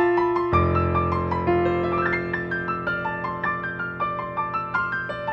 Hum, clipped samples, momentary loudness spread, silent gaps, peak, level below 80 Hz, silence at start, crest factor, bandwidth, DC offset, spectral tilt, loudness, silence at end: none; under 0.1%; 6 LU; none; -6 dBFS; -42 dBFS; 0 s; 18 dB; 5.8 kHz; under 0.1%; -9 dB/octave; -24 LUFS; 0 s